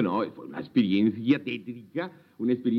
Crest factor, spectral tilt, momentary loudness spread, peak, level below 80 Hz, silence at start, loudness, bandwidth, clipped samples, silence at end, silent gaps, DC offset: 18 dB; -8.5 dB/octave; 12 LU; -10 dBFS; -76 dBFS; 0 s; -28 LUFS; 5.8 kHz; under 0.1%; 0 s; none; under 0.1%